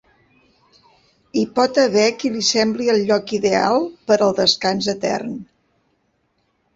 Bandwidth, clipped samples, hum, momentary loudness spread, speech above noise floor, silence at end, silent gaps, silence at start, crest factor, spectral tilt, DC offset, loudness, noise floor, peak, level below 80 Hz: 8 kHz; under 0.1%; none; 8 LU; 49 dB; 1.3 s; none; 1.35 s; 18 dB; -3.5 dB/octave; under 0.1%; -18 LUFS; -66 dBFS; -2 dBFS; -60 dBFS